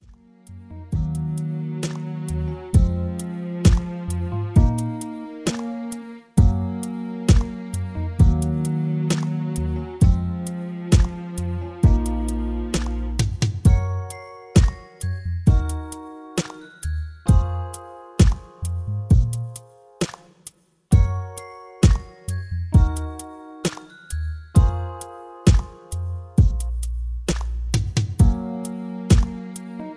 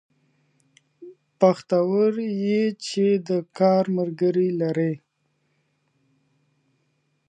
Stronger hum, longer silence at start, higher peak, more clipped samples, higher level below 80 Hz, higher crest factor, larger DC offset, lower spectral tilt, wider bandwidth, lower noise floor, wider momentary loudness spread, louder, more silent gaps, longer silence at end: neither; second, 0.1 s vs 1 s; about the same, -2 dBFS vs -4 dBFS; neither; first, -26 dBFS vs -78 dBFS; about the same, 18 dB vs 20 dB; neither; about the same, -6.5 dB/octave vs -7 dB/octave; first, 11 kHz vs 9.4 kHz; second, -48 dBFS vs -71 dBFS; first, 14 LU vs 6 LU; about the same, -23 LUFS vs -22 LUFS; neither; second, 0 s vs 2.3 s